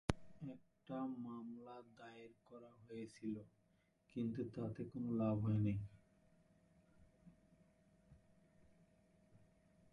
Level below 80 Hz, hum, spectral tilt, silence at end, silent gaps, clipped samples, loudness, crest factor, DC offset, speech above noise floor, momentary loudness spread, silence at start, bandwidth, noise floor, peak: -66 dBFS; none; -8 dB/octave; 0.55 s; none; under 0.1%; -45 LUFS; 30 dB; under 0.1%; 34 dB; 21 LU; 0.1 s; 11 kHz; -78 dBFS; -18 dBFS